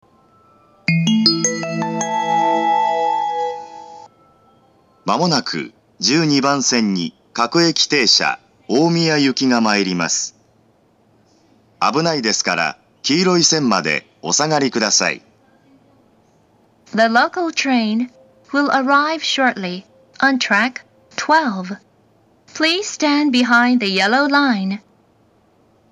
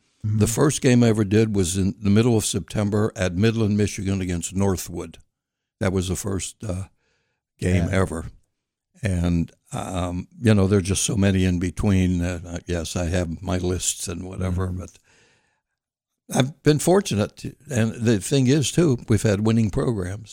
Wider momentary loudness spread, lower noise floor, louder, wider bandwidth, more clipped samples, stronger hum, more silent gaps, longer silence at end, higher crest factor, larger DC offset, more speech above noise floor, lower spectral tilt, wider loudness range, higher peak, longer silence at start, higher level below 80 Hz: about the same, 12 LU vs 11 LU; second, -56 dBFS vs -85 dBFS; first, -16 LUFS vs -22 LUFS; second, 10.5 kHz vs 16.5 kHz; neither; neither; neither; first, 1.15 s vs 0 s; about the same, 18 dB vs 16 dB; neither; second, 40 dB vs 63 dB; second, -3 dB/octave vs -5.5 dB/octave; about the same, 5 LU vs 7 LU; first, 0 dBFS vs -6 dBFS; first, 0.9 s vs 0.25 s; second, -70 dBFS vs -42 dBFS